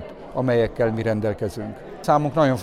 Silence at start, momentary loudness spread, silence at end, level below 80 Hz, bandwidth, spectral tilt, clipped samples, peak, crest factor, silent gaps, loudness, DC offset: 0 s; 11 LU; 0 s; -46 dBFS; 15 kHz; -7.5 dB/octave; under 0.1%; -6 dBFS; 16 dB; none; -22 LUFS; under 0.1%